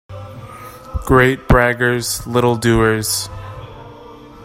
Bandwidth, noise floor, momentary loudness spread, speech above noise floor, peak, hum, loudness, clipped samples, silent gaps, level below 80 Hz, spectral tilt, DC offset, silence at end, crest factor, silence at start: 16 kHz; -38 dBFS; 21 LU; 23 dB; 0 dBFS; none; -15 LUFS; under 0.1%; none; -30 dBFS; -5 dB/octave; under 0.1%; 0 s; 18 dB; 0.1 s